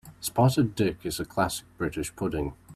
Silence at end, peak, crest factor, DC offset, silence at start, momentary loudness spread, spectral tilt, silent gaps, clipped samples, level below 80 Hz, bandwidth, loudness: 0 s; -8 dBFS; 20 dB; under 0.1%; 0.05 s; 9 LU; -5.5 dB/octave; none; under 0.1%; -48 dBFS; 14.5 kHz; -28 LUFS